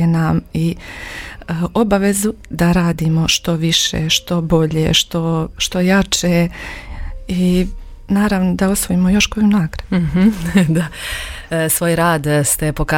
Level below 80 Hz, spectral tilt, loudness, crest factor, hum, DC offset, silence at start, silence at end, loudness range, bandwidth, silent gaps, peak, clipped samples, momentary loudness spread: -32 dBFS; -4.5 dB/octave; -16 LUFS; 16 dB; none; under 0.1%; 0 s; 0 s; 2 LU; 17 kHz; none; 0 dBFS; under 0.1%; 11 LU